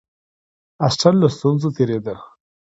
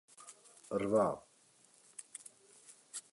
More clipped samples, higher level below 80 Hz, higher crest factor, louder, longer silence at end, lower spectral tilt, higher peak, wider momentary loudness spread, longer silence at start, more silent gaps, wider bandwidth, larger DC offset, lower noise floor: neither; first, -54 dBFS vs -74 dBFS; about the same, 20 dB vs 22 dB; first, -18 LUFS vs -37 LUFS; first, 0.45 s vs 0.15 s; first, -6.5 dB/octave vs -5 dB/octave; first, 0 dBFS vs -20 dBFS; second, 13 LU vs 25 LU; first, 0.8 s vs 0.2 s; neither; second, 8 kHz vs 11.5 kHz; neither; first, under -90 dBFS vs -67 dBFS